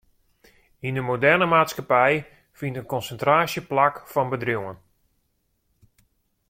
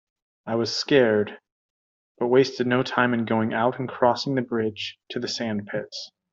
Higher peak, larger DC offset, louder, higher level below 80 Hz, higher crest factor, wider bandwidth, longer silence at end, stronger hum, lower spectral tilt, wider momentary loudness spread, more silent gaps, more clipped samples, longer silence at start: about the same, -4 dBFS vs -4 dBFS; neither; about the same, -22 LUFS vs -24 LUFS; first, -60 dBFS vs -68 dBFS; about the same, 20 dB vs 20 dB; first, 16.5 kHz vs 7.6 kHz; first, 1.75 s vs 0.25 s; neither; about the same, -5.5 dB/octave vs -5.5 dB/octave; about the same, 13 LU vs 12 LU; second, none vs 1.52-2.15 s; neither; first, 0.85 s vs 0.45 s